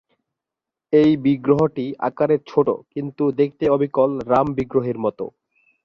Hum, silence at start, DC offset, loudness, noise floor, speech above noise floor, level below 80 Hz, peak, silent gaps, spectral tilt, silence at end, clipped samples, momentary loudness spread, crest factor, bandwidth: none; 0.9 s; under 0.1%; -20 LUFS; -86 dBFS; 67 dB; -54 dBFS; -2 dBFS; none; -9 dB/octave; 0.55 s; under 0.1%; 9 LU; 18 dB; 6.6 kHz